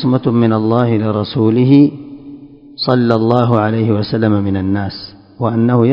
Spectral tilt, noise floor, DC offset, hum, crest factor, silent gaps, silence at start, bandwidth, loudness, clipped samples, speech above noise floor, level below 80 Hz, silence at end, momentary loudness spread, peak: -10 dB/octave; -35 dBFS; under 0.1%; none; 14 dB; none; 0 s; 5.4 kHz; -13 LUFS; under 0.1%; 23 dB; -42 dBFS; 0 s; 13 LU; 0 dBFS